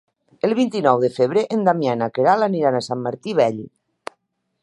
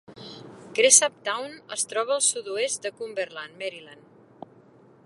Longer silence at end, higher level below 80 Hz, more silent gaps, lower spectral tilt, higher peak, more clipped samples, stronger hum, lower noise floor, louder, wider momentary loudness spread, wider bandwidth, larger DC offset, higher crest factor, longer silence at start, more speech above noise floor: second, 0.95 s vs 1.1 s; first, -68 dBFS vs -78 dBFS; neither; first, -6.5 dB/octave vs 0.5 dB/octave; about the same, -2 dBFS vs 0 dBFS; neither; neither; first, -68 dBFS vs -54 dBFS; first, -19 LUFS vs -23 LUFS; second, 17 LU vs 26 LU; about the same, 11.5 kHz vs 11.5 kHz; neither; second, 18 dB vs 26 dB; first, 0.45 s vs 0.1 s; first, 50 dB vs 29 dB